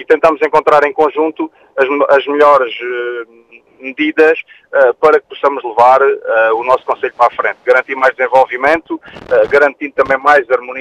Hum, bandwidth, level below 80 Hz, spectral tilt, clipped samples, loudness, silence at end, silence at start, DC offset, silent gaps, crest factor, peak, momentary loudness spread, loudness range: none; 9.8 kHz; -52 dBFS; -5 dB/octave; 0.4%; -12 LUFS; 0 s; 0 s; under 0.1%; none; 12 dB; 0 dBFS; 10 LU; 2 LU